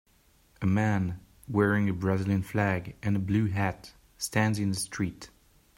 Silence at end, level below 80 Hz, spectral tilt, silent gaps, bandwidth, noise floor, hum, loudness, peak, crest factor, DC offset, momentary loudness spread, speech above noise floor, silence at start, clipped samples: 0.5 s; -58 dBFS; -6 dB/octave; none; 16 kHz; -63 dBFS; none; -29 LUFS; -10 dBFS; 18 dB; under 0.1%; 9 LU; 36 dB; 0.6 s; under 0.1%